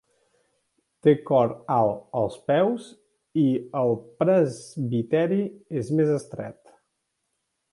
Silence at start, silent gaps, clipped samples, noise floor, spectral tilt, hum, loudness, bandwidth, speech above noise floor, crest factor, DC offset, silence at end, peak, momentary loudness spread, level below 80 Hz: 1.05 s; none; under 0.1%; -78 dBFS; -8 dB/octave; none; -24 LUFS; 11.5 kHz; 54 dB; 20 dB; under 0.1%; 1.2 s; -6 dBFS; 10 LU; -66 dBFS